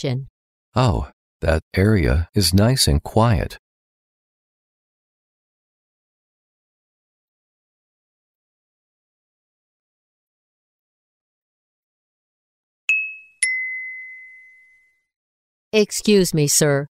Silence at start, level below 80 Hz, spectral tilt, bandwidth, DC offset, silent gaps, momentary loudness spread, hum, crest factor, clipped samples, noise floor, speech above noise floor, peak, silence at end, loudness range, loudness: 0 s; -36 dBFS; -4.5 dB/octave; 16 kHz; under 0.1%; 0.30-0.72 s, 1.13-1.40 s, 1.62-1.71 s, 3.59-12.88 s, 15.16-15.71 s; 13 LU; none; 20 dB; under 0.1%; -58 dBFS; 40 dB; -4 dBFS; 0.05 s; 9 LU; -19 LUFS